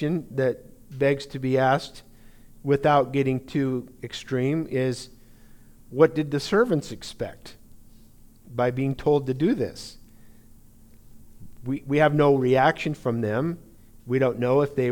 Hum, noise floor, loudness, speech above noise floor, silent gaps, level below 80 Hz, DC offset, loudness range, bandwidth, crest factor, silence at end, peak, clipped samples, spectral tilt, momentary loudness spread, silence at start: none; -50 dBFS; -24 LUFS; 27 dB; none; -52 dBFS; under 0.1%; 4 LU; 19 kHz; 20 dB; 0 s; -4 dBFS; under 0.1%; -7 dB/octave; 16 LU; 0 s